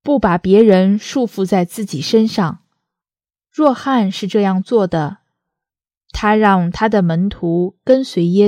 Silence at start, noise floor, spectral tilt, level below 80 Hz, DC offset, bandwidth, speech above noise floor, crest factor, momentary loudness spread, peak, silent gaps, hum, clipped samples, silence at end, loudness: 0.05 s; under -90 dBFS; -7 dB/octave; -42 dBFS; under 0.1%; 15 kHz; over 76 dB; 14 dB; 10 LU; 0 dBFS; none; none; under 0.1%; 0 s; -15 LUFS